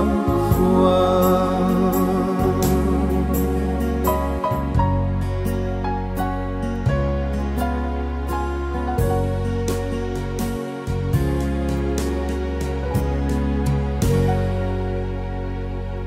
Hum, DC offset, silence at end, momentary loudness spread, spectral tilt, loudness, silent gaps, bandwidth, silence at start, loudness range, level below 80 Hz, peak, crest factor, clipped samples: none; under 0.1%; 0 s; 8 LU; -7.5 dB/octave; -22 LUFS; none; 16 kHz; 0 s; 5 LU; -26 dBFS; -4 dBFS; 16 dB; under 0.1%